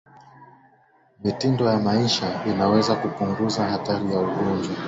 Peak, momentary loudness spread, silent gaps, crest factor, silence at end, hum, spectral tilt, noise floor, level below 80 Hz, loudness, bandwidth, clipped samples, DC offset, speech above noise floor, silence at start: -6 dBFS; 5 LU; none; 16 dB; 0 s; none; -6 dB/octave; -59 dBFS; -54 dBFS; -23 LUFS; 8 kHz; under 0.1%; under 0.1%; 37 dB; 0.4 s